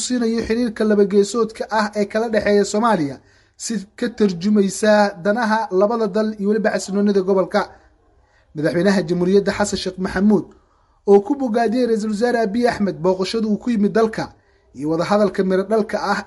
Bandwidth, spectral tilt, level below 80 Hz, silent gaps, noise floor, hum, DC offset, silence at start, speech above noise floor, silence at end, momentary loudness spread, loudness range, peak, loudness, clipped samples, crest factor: 11.5 kHz; -5.5 dB/octave; -50 dBFS; none; -56 dBFS; none; under 0.1%; 0 s; 38 dB; 0 s; 8 LU; 2 LU; -2 dBFS; -19 LUFS; under 0.1%; 18 dB